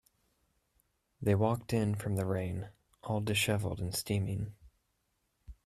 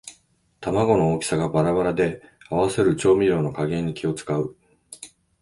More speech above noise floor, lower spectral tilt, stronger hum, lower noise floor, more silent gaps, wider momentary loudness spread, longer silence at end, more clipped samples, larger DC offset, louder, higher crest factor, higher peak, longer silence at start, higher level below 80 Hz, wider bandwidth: first, 47 dB vs 39 dB; about the same, -5.5 dB/octave vs -6.5 dB/octave; neither; first, -79 dBFS vs -61 dBFS; neither; second, 11 LU vs 21 LU; second, 0.15 s vs 0.35 s; neither; neither; second, -34 LUFS vs -22 LUFS; about the same, 18 dB vs 16 dB; second, -16 dBFS vs -6 dBFS; first, 1.2 s vs 0.05 s; second, -58 dBFS vs -50 dBFS; first, 15 kHz vs 11.5 kHz